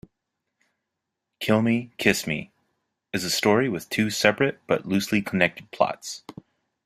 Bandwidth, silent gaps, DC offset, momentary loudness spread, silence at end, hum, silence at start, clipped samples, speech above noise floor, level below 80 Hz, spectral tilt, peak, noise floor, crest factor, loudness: 16 kHz; none; under 0.1%; 11 LU; 0.65 s; none; 1.4 s; under 0.1%; 59 dB; -60 dBFS; -4.5 dB/octave; -2 dBFS; -83 dBFS; 24 dB; -24 LUFS